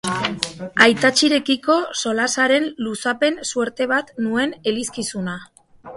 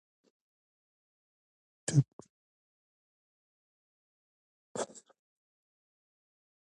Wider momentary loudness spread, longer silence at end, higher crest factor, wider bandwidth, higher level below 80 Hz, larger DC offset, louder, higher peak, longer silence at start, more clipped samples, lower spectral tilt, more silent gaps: second, 11 LU vs 14 LU; second, 0 s vs 1.7 s; second, 20 dB vs 28 dB; about the same, 11.5 kHz vs 10.5 kHz; first, -60 dBFS vs -78 dBFS; neither; first, -19 LUFS vs -35 LUFS; first, 0 dBFS vs -14 dBFS; second, 0.05 s vs 1.9 s; neither; second, -3 dB/octave vs -6 dB/octave; second, none vs 2.13-2.19 s, 2.30-4.75 s